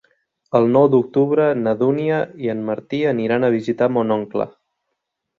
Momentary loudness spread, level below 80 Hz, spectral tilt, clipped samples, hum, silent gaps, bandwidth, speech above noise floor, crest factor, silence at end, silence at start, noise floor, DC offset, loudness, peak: 10 LU; -62 dBFS; -9 dB/octave; under 0.1%; none; none; 7.2 kHz; 59 dB; 18 dB; 0.9 s; 0.55 s; -77 dBFS; under 0.1%; -18 LUFS; -2 dBFS